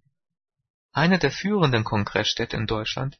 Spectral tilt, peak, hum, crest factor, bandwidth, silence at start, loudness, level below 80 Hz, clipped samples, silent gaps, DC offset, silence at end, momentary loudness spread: -5.5 dB/octave; -6 dBFS; none; 18 dB; 6.6 kHz; 0.95 s; -23 LUFS; -48 dBFS; under 0.1%; none; under 0.1%; 0.1 s; 6 LU